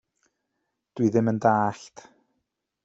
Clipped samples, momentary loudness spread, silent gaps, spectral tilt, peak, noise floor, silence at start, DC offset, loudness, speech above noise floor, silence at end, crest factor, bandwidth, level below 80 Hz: under 0.1%; 19 LU; none; -7.5 dB/octave; -6 dBFS; -80 dBFS; 0.95 s; under 0.1%; -24 LUFS; 56 dB; 0.95 s; 22 dB; 8 kHz; -68 dBFS